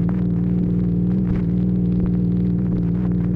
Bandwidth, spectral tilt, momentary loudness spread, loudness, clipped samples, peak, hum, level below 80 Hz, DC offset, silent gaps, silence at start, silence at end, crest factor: 2.8 kHz; -12.5 dB/octave; 1 LU; -20 LUFS; under 0.1%; -10 dBFS; 60 Hz at -25 dBFS; -32 dBFS; under 0.1%; none; 0 s; 0 s; 10 dB